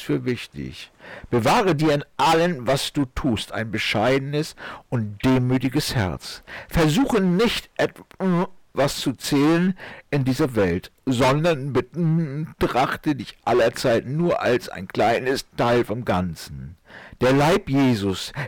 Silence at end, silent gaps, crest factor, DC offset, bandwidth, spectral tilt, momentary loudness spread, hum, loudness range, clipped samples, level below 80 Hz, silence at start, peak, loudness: 0 s; none; 8 dB; under 0.1%; 18.5 kHz; -6 dB/octave; 11 LU; none; 2 LU; under 0.1%; -44 dBFS; 0 s; -14 dBFS; -22 LUFS